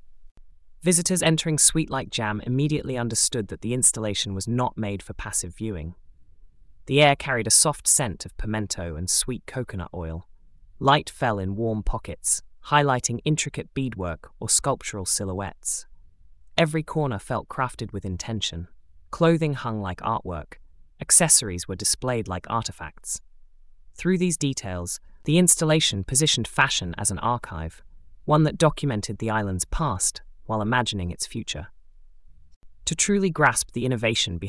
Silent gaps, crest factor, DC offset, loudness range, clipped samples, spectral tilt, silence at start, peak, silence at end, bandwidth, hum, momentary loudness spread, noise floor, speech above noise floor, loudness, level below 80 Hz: 0.31-0.35 s, 32.56-32.61 s; 24 dB; under 0.1%; 6 LU; under 0.1%; -3.5 dB/octave; 0.05 s; -2 dBFS; 0 s; 12 kHz; none; 14 LU; -49 dBFS; 25 dB; -23 LUFS; -44 dBFS